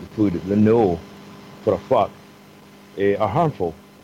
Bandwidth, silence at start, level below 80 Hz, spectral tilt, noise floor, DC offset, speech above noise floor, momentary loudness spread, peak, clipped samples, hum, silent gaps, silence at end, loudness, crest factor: 15.5 kHz; 0 s; -52 dBFS; -8.5 dB/octave; -46 dBFS; under 0.1%; 27 dB; 21 LU; -6 dBFS; under 0.1%; none; none; 0.3 s; -21 LUFS; 14 dB